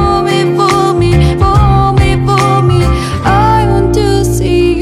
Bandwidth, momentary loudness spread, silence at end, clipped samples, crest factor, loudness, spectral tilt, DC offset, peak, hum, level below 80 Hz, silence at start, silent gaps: 13.5 kHz; 3 LU; 0 s; under 0.1%; 8 dB; -10 LUFS; -6.5 dB/octave; under 0.1%; 0 dBFS; none; -18 dBFS; 0 s; none